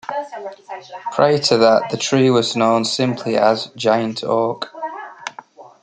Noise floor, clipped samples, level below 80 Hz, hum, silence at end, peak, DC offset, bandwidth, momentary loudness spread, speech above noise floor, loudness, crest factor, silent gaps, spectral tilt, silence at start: -41 dBFS; under 0.1%; -64 dBFS; none; 0.15 s; -2 dBFS; under 0.1%; 9.4 kHz; 18 LU; 24 dB; -17 LUFS; 16 dB; none; -4.5 dB/octave; 0.1 s